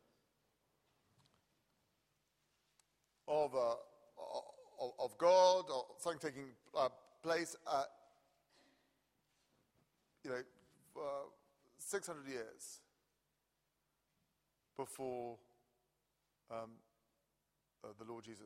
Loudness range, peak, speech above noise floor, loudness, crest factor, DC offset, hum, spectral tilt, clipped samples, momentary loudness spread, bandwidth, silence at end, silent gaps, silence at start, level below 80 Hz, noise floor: 16 LU; -20 dBFS; 46 dB; -40 LUFS; 24 dB; under 0.1%; none; -3 dB/octave; under 0.1%; 21 LU; 15.5 kHz; 0 s; none; 3.25 s; -86 dBFS; -86 dBFS